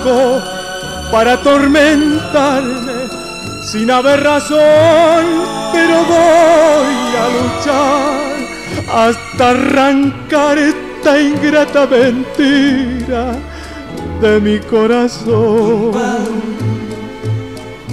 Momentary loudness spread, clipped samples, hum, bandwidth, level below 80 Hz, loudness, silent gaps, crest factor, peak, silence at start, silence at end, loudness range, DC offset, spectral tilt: 13 LU; under 0.1%; none; 14.5 kHz; -36 dBFS; -12 LUFS; none; 8 dB; -2 dBFS; 0 s; 0 s; 4 LU; 0.4%; -5 dB/octave